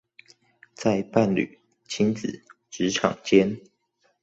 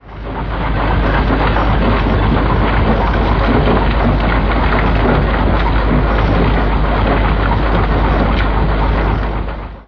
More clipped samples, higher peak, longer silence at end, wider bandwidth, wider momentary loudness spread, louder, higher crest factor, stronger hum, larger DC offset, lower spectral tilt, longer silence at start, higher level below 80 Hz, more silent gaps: neither; second, -4 dBFS vs 0 dBFS; first, 0.65 s vs 0.05 s; first, 8 kHz vs 5.4 kHz; first, 15 LU vs 4 LU; second, -24 LUFS vs -14 LUFS; first, 22 dB vs 12 dB; neither; neither; second, -5.5 dB/octave vs -9 dB/octave; first, 0.8 s vs 0.05 s; second, -60 dBFS vs -16 dBFS; neither